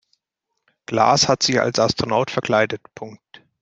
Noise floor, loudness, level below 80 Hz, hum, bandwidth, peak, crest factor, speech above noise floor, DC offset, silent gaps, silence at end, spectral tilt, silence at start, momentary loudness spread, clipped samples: -79 dBFS; -18 LUFS; -54 dBFS; none; 9.8 kHz; -2 dBFS; 20 dB; 59 dB; under 0.1%; none; 0.45 s; -3.5 dB/octave; 0.9 s; 19 LU; under 0.1%